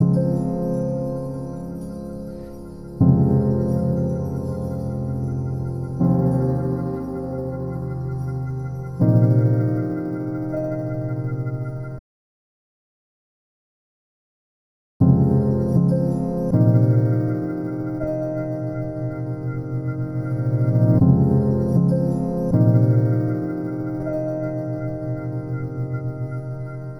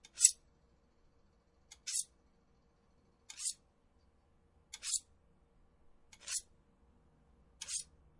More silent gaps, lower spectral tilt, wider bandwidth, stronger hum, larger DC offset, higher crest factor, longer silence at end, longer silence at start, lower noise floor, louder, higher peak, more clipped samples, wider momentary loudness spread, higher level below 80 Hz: first, 11.99-15.00 s vs none; first, -11.5 dB/octave vs 2.5 dB/octave; second, 6 kHz vs 11.5 kHz; neither; neither; second, 18 dB vs 34 dB; second, 0 s vs 0.35 s; second, 0 s vs 0.15 s; first, under -90 dBFS vs -71 dBFS; first, -22 LUFS vs -36 LUFS; first, -4 dBFS vs -8 dBFS; neither; second, 12 LU vs 24 LU; first, -42 dBFS vs -72 dBFS